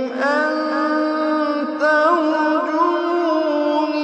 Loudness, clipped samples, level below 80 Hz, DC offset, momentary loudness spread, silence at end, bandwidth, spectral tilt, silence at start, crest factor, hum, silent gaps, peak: -18 LUFS; under 0.1%; -74 dBFS; under 0.1%; 4 LU; 0 s; 8.4 kHz; -3.5 dB/octave; 0 s; 14 dB; none; none; -4 dBFS